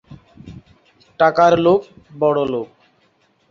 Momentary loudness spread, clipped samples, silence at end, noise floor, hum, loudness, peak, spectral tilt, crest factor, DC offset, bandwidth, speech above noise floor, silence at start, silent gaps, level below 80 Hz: 12 LU; under 0.1%; 0.85 s; -60 dBFS; none; -16 LUFS; -2 dBFS; -6.5 dB/octave; 18 dB; under 0.1%; 7.2 kHz; 45 dB; 0.1 s; none; -54 dBFS